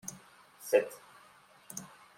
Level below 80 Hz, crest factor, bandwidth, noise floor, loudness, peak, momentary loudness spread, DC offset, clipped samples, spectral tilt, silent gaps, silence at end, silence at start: -82 dBFS; 24 dB; 16.5 kHz; -60 dBFS; -34 LUFS; -12 dBFS; 21 LU; under 0.1%; under 0.1%; -3 dB/octave; none; 0.3 s; 0.05 s